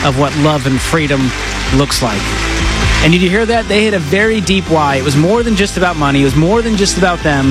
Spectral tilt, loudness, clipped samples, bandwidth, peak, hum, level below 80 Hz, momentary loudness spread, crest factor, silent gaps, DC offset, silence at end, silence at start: -5 dB/octave; -12 LUFS; under 0.1%; 15.5 kHz; 0 dBFS; none; -24 dBFS; 4 LU; 12 dB; none; under 0.1%; 0 s; 0 s